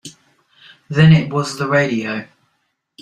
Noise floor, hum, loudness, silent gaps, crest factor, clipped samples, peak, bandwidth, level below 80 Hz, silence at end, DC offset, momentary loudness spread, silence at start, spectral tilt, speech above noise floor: -68 dBFS; none; -16 LUFS; none; 16 dB; under 0.1%; -2 dBFS; 10 kHz; -52 dBFS; 0.8 s; under 0.1%; 13 LU; 0.05 s; -6.5 dB/octave; 54 dB